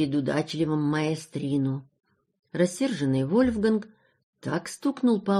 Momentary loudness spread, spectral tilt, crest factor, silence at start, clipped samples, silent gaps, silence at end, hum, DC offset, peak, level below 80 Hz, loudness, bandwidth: 8 LU; -6.5 dB/octave; 16 dB; 0 s; under 0.1%; 2.39-2.43 s, 4.23-4.33 s; 0 s; none; under 0.1%; -10 dBFS; -56 dBFS; -27 LUFS; 13 kHz